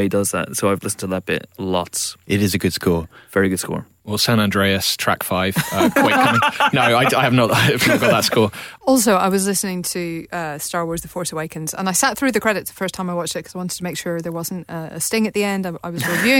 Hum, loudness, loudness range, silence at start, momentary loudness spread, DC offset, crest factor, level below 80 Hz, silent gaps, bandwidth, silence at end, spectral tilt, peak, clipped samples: none; -19 LUFS; 7 LU; 0 s; 11 LU; under 0.1%; 14 dB; -50 dBFS; none; 17.5 kHz; 0 s; -4 dB/octave; -4 dBFS; under 0.1%